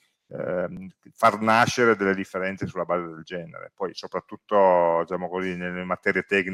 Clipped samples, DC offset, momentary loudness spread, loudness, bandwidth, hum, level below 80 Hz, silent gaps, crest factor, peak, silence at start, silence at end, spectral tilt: under 0.1%; under 0.1%; 16 LU; -24 LUFS; 15.5 kHz; none; -66 dBFS; none; 18 dB; -6 dBFS; 0.3 s; 0 s; -5 dB/octave